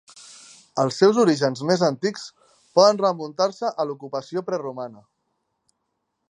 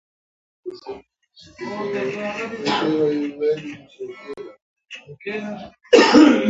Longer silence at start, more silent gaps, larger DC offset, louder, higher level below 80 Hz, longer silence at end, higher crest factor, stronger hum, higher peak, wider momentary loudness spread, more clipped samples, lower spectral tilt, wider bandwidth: about the same, 0.75 s vs 0.65 s; second, none vs 4.62-4.76 s; neither; second, -22 LUFS vs -19 LUFS; second, -74 dBFS vs -60 dBFS; first, 1.35 s vs 0 s; about the same, 22 dB vs 20 dB; neither; about the same, -2 dBFS vs 0 dBFS; second, 19 LU vs 24 LU; neither; about the same, -5 dB/octave vs -4.5 dB/octave; first, 10.5 kHz vs 8 kHz